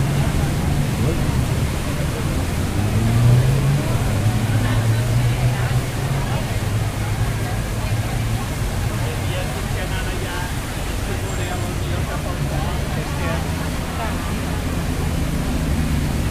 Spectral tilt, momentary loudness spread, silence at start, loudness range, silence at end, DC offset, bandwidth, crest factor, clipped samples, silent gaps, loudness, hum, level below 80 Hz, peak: -5.5 dB/octave; 5 LU; 0 s; 5 LU; 0 s; under 0.1%; 16 kHz; 16 dB; under 0.1%; none; -21 LUFS; none; -26 dBFS; -4 dBFS